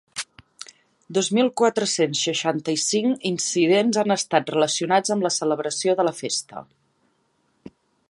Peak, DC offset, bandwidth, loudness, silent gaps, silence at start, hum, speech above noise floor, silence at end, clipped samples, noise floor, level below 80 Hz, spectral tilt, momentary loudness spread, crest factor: -2 dBFS; under 0.1%; 11.5 kHz; -22 LUFS; none; 0.15 s; none; 46 dB; 0.4 s; under 0.1%; -67 dBFS; -72 dBFS; -3.5 dB/octave; 16 LU; 22 dB